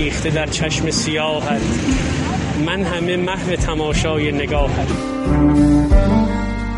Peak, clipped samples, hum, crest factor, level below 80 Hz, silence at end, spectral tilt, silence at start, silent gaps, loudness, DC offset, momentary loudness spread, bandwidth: -2 dBFS; under 0.1%; none; 16 dB; -24 dBFS; 0 s; -5.5 dB/octave; 0 s; none; -18 LUFS; under 0.1%; 6 LU; 11.5 kHz